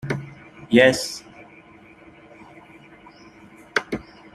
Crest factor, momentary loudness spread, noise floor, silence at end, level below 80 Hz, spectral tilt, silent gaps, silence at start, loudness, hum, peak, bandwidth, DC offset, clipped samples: 24 dB; 26 LU; -48 dBFS; 0.3 s; -58 dBFS; -4.5 dB/octave; none; 0.05 s; -21 LUFS; none; -2 dBFS; 14 kHz; under 0.1%; under 0.1%